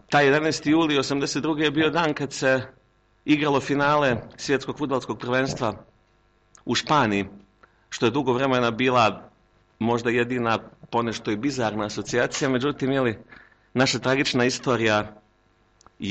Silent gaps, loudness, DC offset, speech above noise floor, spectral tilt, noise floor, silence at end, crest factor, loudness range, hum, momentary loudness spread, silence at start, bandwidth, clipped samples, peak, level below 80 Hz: none; -23 LUFS; under 0.1%; 39 dB; -4.5 dB/octave; -62 dBFS; 0 s; 14 dB; 3 LU; none; 9 LU; 0.1 s; 8.8 kHz; under 0.1%; -10 dBFS; -56 dBFS